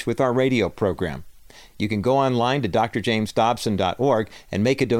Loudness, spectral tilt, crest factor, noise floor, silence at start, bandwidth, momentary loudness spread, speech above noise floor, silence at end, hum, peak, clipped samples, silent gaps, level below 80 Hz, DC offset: -22 LUFS; -6 dB/octave; 14 dB; -46 dBFS; 0 s; 16.5 kHz; 8 LU; 25 dB; 0 s; none; -6 dBFS; under 0.1%; none; -50 dBFS; under 0.1%